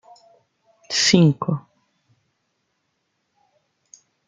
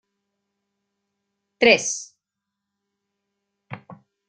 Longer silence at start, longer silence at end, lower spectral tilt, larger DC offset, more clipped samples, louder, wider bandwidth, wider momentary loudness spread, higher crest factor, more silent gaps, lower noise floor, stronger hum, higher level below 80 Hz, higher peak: second, 0.9 s vs 1.6 s; first, 2.7 s vs 0.35 s; first, -4.5 dB/octave vs -2 dB/octave; neither; neither; about the same, -18 LUFS vs -19 LUFS; about the same, 9.4 kHz vs 9.4 kHz; second, 12 LU vs 25 LU; about the same, 24 dB vs 26 dB; neither; second, -73 dBFS vs -84 dBFS; neither; about the same, -62 dBFS vs -66 dBFS; about the same, 0 dBFS vs -2 dBFS